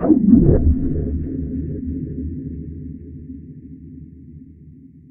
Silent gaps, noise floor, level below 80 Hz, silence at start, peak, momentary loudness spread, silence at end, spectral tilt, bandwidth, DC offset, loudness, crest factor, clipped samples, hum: none; -43 dBFS; -28 dBFS; 0 s; 0 dBFS; 26 LU; 0.25 s; -12.5 dB/octave; 2.1 kHz; under 0.1%; -19 LUFS; 20 dB; under 0.1%; none